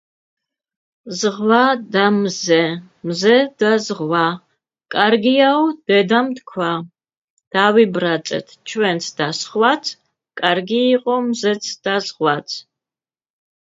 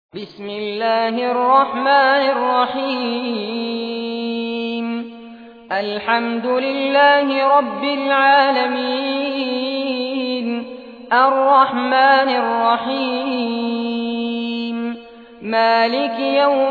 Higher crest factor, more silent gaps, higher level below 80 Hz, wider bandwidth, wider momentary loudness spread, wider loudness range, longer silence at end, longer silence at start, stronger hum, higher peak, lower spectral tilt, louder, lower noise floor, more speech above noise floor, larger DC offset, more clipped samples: about the same, 18 dB vs 16 dB; first, 7.17-7.37 s, 7.47-7.51 s vs none; about the same, -68 dBFS vs -66 dBFS; first, 7.8 kHz vs 5 kHz; about the same, 12 LU vs 12 LU; second, 3 LU vs 6 LU; first, 1.1 s vs 0 s; first, 1.05 s vs 0.15 s; neither; about the same, 0 dBFS vs -2 dBFS; second, -4.5 dB/octave vs -6 dB/octave; about the same, -17 LUFS vs -17 LUFS; first, under -90 dBFS vs -38 dBFS; first, over 73 dB vs 22 dB; neither; neither